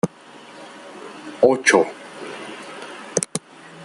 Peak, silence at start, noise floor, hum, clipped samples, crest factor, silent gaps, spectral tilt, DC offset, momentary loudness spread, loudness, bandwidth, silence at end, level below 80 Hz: 0 dBFS; 0.05 s; -43 dBFS; none; under 0.1%; 22 dB; none; -3.5 dB/octave; under 0.1%; 24 LU; -19 LUFS; 12 kHz; 0 s; -64 dBFS